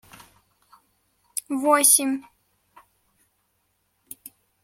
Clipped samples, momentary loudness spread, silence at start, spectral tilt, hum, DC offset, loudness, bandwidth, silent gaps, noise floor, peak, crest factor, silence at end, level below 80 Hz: under 0.1%; 27 LU; 1.35 s; 0 dB/octave; none; under 0.1%; -20 LUFS; 16.5 kHz; none; -71 dBFS; -2 dBFS; 24 dB; 2.4 s; -74 dBFS